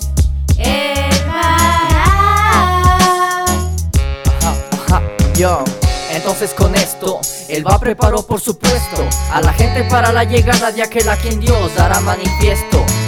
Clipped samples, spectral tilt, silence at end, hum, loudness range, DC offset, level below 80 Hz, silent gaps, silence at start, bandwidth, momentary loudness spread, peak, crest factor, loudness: under 0.1%; -4.5 dB/octave; 0 s; none; 3 LU; under 0.1%; -18 dBFS; none; 0 s; 18.5 kHz; 6 LU; 0 dBFS; 12 dB; -13 LUFS